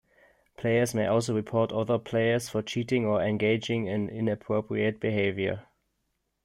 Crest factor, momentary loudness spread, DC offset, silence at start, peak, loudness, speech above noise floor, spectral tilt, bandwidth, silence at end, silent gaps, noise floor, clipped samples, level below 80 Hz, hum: 16 dB; 5 LU; under 0.1%; 0.6 s; -12 dBFS; -28 LUFS; 51 dB; -6 dB/octave; 15 kHz; 0.85 s; none; -78 dBFS; under 0.1%; -64 dBFS; none